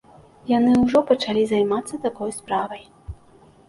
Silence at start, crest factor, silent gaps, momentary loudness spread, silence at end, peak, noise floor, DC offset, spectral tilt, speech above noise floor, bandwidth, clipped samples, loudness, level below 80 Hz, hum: 0.45 s; 18 dB; none; 21 LU; 0.55 s; -4 dBFS; -52 dBFS; under 0.1%; -5.5 dB/octave; 31 dB; 11.5 kHz; under 0.1%; -21 LUFS; -48 dBFS; none